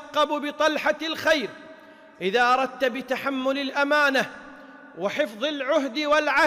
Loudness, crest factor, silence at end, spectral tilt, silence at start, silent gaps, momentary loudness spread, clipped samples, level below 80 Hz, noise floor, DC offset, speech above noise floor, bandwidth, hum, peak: -24 LUFS; 14 dB; 0 s; -3 dB/octave; 0 s; none; 12 LU; under 0.1%; -64 dBFS; -48 dBFS; under 0.1%; 24 dB; 15.5 kHz; none; -12 dBFS